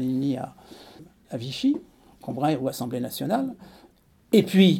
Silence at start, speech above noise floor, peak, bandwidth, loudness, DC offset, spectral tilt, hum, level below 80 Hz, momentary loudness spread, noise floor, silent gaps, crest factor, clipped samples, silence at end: 0 s; 34 dB; -6 dBFS; 17 kHz; -26 LUFS; under 0.1%; -6.5 dB/octave; none; -64 dBFS; 21 LU; -57 dBFS; none; 20 dB; under 0.1%; 0 s